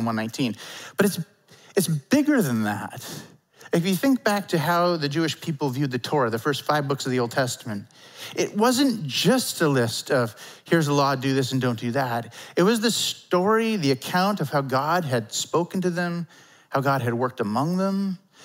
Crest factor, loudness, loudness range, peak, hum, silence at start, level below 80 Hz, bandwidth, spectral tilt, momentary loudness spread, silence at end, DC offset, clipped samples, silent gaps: 18 dB; -24 LUFS; 3 LU; -6 dBFS; none; 0 s; -74 dBFS; 16.5 kHz; -5 dB/octave; 10 LU; 0 s; under 0.1%; under 0.1%; none